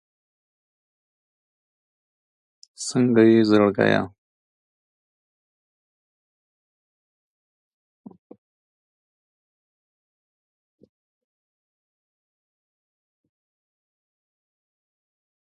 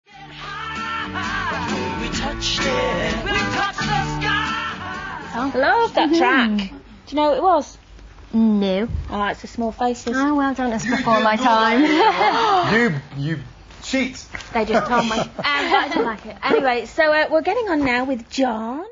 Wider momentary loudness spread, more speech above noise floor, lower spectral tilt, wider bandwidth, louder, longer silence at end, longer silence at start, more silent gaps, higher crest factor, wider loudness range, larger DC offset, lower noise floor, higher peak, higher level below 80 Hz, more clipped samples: first, 14 LU vs 11 LU; first, over 72 dB vs 23 dB; first, -6 dB/octave vs -4.5 dB/octave; first, 11.5 kHz vs 7.6 kHz; about the same, -19 LUFS vs -20 LUFS; first, 11.4 s vs 0 s; first, 2.8 s vs 0.15 s; neither; first, 24 dB vs 16 dB; first, 8 LU vs 4 LU; neither; first, under -90 dBFS vs -42 dBFS; about the same, -4 dBFS vs -4 dBFS; second, -66 dBFS vs -40 dBFS; neither